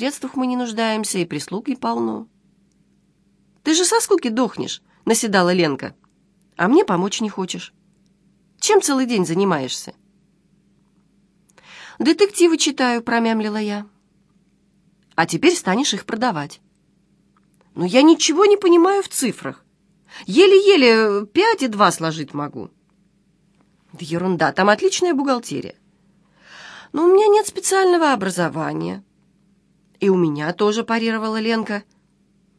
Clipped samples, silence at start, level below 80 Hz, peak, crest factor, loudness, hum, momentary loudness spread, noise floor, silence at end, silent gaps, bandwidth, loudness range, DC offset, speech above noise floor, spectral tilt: under 0.1%; 0 s; -68 dBFS; 0 dBFS; 20 dB; -18 LUFS; none; 16 LU; -60 dBFS; 0.75 s; none; 11 kHz; 6 LU; under 0.1%; 43 dB; -4 dB/octave